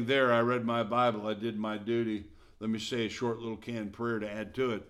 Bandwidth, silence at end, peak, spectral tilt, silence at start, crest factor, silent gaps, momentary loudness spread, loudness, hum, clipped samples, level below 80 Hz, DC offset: 13 kHz; 0 s; -14 dBFS; -6 dB/octave; 0 s; 18 dB; none; 11 LU; -32 LUFS; none; under 0.1%; -64 dBFS; under 0.1%